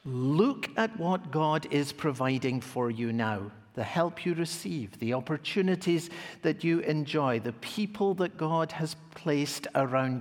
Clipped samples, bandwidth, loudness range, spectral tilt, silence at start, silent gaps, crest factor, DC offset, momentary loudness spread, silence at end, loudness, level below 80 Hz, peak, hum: under 0.1%; 18 kHz; 2 LU; -6 dB/octave; 0.05 s; none; 18 dB; under 0.1%; 7 LU; 0 s; -30 LUFS; -72 dBFS; -12 dBFS; none